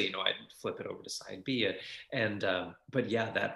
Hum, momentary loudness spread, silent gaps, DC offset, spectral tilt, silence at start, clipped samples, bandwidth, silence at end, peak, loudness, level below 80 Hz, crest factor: none; 9 LU; none; under 0.1%; -4 dB/octave; 0 s; under 0.1%; 12.5 kHz; 0 s; -12 dBFS; -35 LUFS; -76 dBFS; 22 dB